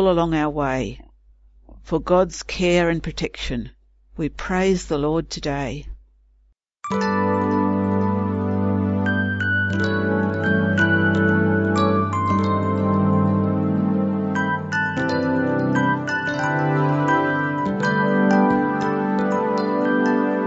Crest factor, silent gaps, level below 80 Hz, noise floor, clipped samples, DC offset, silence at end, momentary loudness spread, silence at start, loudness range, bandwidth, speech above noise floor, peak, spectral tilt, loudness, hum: 16 dB; none; -42 dBFS; -60 dBFS; under 0.1%; under 0.1%; 0 s; 8 LU; 0 s; 5 LU; 8 kHz; 39 dB; -4 dBFS; -7 dB/octave; -21 LUFS; none